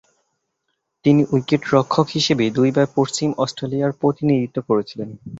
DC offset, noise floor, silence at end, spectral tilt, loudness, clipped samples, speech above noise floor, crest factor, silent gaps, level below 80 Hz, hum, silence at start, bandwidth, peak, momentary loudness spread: under 0.1%; -74 dBFS; 0 s; -6 dB/octave; -19 LUFS; under 0.1%; 56 dB; 18 dB; none; -56 dBFS; none; 1.05 s; 8 kHz; -2 dBFS; 5 LU